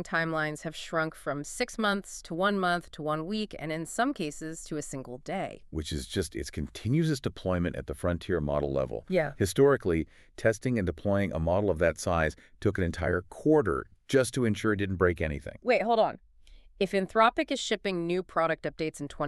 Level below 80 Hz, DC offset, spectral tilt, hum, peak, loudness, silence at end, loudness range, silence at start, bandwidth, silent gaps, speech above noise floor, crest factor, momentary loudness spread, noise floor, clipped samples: -48 dBFS; under 0.1%; -5.5 dB/octave; none; -8 dBFS; -29 LUFS; 0 s; 6 LU; 0 s; 13.5 kHz; none; 25 dB; 20 dB; 11 LU; -54 dBFS; under 0.1%